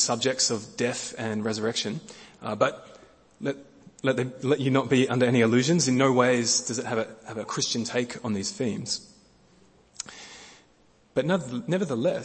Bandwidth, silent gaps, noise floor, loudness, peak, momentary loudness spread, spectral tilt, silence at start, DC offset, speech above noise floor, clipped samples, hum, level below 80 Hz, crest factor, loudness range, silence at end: 8.8 kHz; none; -61 dBFS; -26 LUFS; -6 dBFS; 17 LU; -4 dB/octave; 0 s; under 0.1%; 35 dB; under 0.1%; none; -66 dBFS; 22 dB; 9 LU; 0 s